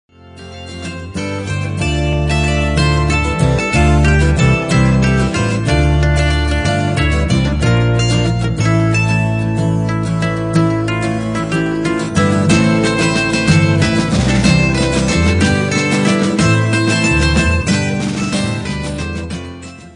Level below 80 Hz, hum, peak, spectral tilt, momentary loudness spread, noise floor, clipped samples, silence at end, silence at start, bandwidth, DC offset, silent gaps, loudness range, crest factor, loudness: -24 dBFS; none; -2 dBFS; -5.5 dB/octave; 9 LU; -34 dBFS; under 0.1%; 0.05 s; 0.25 s; 10.5 kHz; under 0.1%; none; 3 LU; 12 dB; -14 LUFS